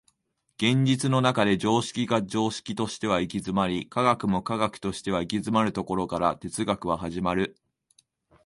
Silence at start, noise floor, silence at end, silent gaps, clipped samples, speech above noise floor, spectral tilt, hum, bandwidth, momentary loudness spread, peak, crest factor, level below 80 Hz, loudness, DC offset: 0.6 s; -75 dBFS; 0.95 s; none; under 0.1%; 49 dB; -5.5 dB/octave; none; 11.5 kHz; 7 LU; -8 dBFS; 20 dB; -54 dBFS; -26 LUFS; under 0.1%